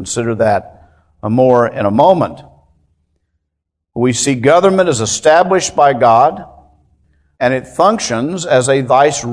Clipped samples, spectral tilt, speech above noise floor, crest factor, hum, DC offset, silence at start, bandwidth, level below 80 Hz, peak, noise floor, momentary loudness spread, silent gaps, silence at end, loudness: 0.2%; -4.5 dB/octave; 63 dB; 14 dB; none; under 0.1%; 0 s; 11 kHz; -48 dBFS; 0 dBFS; -75 dBFS; 8 LU; none; 0 s; -12 LUFS